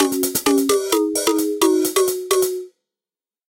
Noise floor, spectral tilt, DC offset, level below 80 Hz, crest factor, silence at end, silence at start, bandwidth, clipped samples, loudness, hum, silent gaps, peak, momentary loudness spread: under -90 dBFS; -2 dB/octave; under 0.1%; -60 dBFS; 16 dB; 0.85 s; 0 s; 17.5 kHz; under 0.1%; -18 LUFS; none; none; -4 dBFS; 3 LU